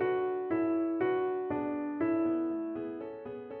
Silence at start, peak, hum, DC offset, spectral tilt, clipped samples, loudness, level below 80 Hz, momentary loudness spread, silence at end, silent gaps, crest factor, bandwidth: 0 s; -20 dBFS; none; under 0.1%; -6 dB/octave; under 0.1%; -33 LUFS; -70 dBFS; 11 LU; 0 s; none; 12 dB; 3.6 kHz